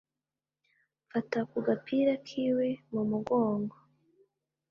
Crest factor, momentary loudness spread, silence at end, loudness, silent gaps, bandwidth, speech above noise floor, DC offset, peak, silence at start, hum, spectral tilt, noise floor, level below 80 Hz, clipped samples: 18 dB; 7 LU; 1 s; -31 LUFS; none; 7 kHz; over 60 dB; under 0.1%; -16 dBFS; 1.15 s; none; -7.5 dB/octave; under -90 dBFS; -74 dBFS; under 0.1%